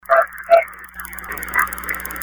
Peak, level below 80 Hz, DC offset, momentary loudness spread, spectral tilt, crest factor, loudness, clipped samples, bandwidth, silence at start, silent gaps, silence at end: 0 dBFS; -44 dBFS; under 0.1%; 15 LU; -2.5 dB/octave; 20 dB; -18 LUFS; under 0.1%; over 20 kHz; 0.1 s; none; 0 s